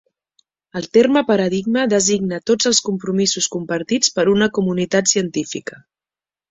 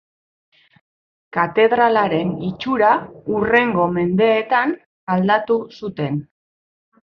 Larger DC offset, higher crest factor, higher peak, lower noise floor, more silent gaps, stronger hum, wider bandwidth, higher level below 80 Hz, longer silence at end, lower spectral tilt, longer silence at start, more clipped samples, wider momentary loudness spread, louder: neither; about the same, 18 dB vs 18 dB; about the same, 0 dBFS vs -2 dBFS; about the same, under -90 dBFS vs under -90 dBFS; second, none vs 4.86-5.07 s; neither; first, 8.2 kHz vs 6 kHz; about the same, -56 dBFS vs -56 dBFS; about the same, 0.75 s vs 0.85 s; second, -3.5 dB/octave vs -8.5 dB/octave; second, 0.75 s vs 1.35 s; neither; about the same, 9 LU vs 10 LU; about the same, -17 LUFS vs -18 LUFS